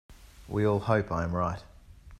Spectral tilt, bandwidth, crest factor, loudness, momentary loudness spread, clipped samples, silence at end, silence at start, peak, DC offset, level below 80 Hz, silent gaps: -8 dB/octave; 12.5 kHz; 20 dB; -29 LUFS; 8 LU; under 0.1%; 0.05 s; 0.1 s; -10 dBFS; under 0.1%; -50 dBFS; none